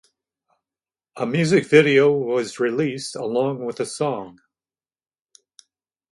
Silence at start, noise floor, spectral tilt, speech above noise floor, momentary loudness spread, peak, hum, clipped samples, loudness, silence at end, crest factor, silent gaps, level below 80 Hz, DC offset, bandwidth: 1.15 s; under -90 dBFS; -5.5 dB/octave; over 70 dB; 13 LU; 0 dBFS; none; under 0.1%; -20 LUFS; 1.8 s; 22 dB; none; -68 dBFS; under 0.1%; 11.5 kHz